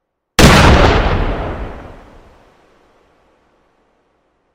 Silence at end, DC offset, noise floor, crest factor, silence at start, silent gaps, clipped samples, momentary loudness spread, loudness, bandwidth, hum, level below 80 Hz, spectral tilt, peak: 2.65 s; under 0.1%; -61 dBFS; 14 dB; 0.4 s; none; 0.8%; 22 LU; -11 LUFS; over 20 kHz; none; -20 dBFS; -5 dB/octave; 0 dBFS